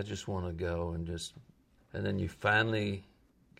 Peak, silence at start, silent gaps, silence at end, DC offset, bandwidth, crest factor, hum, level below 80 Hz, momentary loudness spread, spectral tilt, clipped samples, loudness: -16 dBFS; 0 s; none; 0.55 s; under 0.1%; 13 kHz; 20 dB; none; -58 dBFS; 14 LU; -5.5 dB/octave; under 0.1%; -34 LUFS